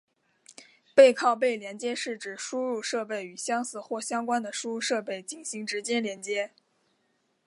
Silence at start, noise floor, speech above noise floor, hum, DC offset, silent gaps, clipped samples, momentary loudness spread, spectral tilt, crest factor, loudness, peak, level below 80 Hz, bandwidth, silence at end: 0.6 s; -73 dBFS; 45 dB; none; under 0.1%; none; under 0.1%; 15 LU; -2.5 dB/octave; 24 dB; -28 LUFS; -4 dBFS; -86 dBFS; 11.5 kHz; 1 s